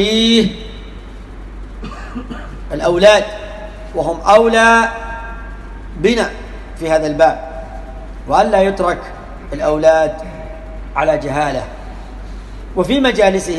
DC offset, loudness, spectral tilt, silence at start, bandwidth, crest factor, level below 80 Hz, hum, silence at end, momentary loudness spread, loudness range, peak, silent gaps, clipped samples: under 0.1%; -14 LUFS; -4.5 dB/octave; 0 s; 12 kHz; 16 dB; -30 dBFS; none; 0 s; 22 LU; 5 LU; 0 dBFS; none; under 0.1%